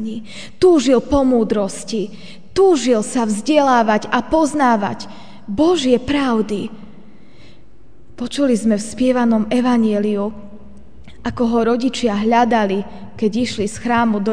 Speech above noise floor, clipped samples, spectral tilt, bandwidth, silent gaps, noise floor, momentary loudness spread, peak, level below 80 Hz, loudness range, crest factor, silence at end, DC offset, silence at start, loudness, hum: 32 dB; under 0.1%; -5 dB/octave; 10 kHz; none; -48 dBFS; 14 LU; 0 dBFS; -42 dBFS; 4 LU; 16 dB; 0 s; 2%; 0 s; -17 LUFS; none